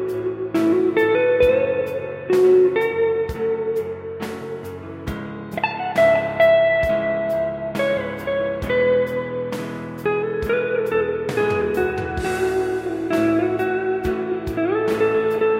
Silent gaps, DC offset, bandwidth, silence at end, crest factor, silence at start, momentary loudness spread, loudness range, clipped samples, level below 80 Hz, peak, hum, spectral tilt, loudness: none; under 0.1%; 16 kHz; 0 s; 14 dB; 0 s; 13 LU; 4 LU; under 0.1%; -42 dBFS; -6 dBFS; none; -6.5 dB/octave; -20 LUFS